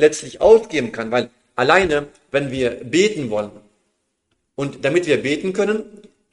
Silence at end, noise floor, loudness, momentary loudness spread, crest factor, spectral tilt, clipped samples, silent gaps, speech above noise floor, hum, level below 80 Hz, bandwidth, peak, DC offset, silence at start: 0.35 s; -71 dBFS; -19 LUFS; 12 LU; 20 dB; -4.5 dB/octave; under 0.1%; none; 52 dB; none; -50 dBFS; 11.5 kHz; 0 dBFS; under 0.1%; 0 s